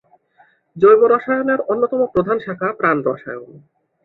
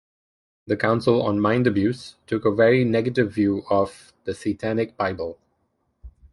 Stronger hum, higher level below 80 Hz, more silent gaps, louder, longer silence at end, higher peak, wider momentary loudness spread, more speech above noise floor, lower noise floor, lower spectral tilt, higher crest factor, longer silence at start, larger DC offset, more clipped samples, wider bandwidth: neither; about the same, -56 dBFS vs -54 dBFS; neither; first, -16 LUFS vs -22 LUFS; first, 0.45 s vs 0.25 s; about the same, -2 dBFS vs -4 dBFS; about the same, 12 LU vs 11 LU; second, 39 dB vs 49 dB; second, -55 dBFS vs -71 dBFS; first, -9.5 dB/octave vs -7.5 dB/octave; about the same, 16 dB vs 18 dB; about the same, 0.75 s vs 0.65 s; neither; neither; second, 4.2 kHz vs 11.5 kHz